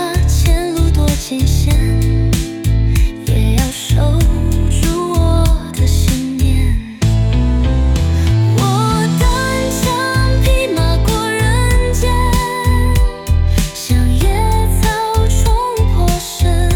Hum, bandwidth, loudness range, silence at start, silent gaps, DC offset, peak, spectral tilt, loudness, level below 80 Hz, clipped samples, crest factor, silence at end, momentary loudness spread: none; 18 kHz; 1 LU; 0 s; none; under 0.1%; -2 dBFS; -5.5 dB/octave; -14 LUFS; -16 dBFS; under 0.1%; 10 dB; 0 s; 3 LU